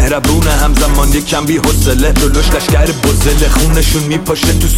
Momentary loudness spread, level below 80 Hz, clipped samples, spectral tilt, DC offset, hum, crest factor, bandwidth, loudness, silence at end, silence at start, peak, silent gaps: 2 LU; -12 dBFS; under 0.1%; -4.5 dB/octave; under 0.1%; none; 10 dB; 16.5 kHz; -11 LUFS; 0 s; 0 s; 0 dBFS; none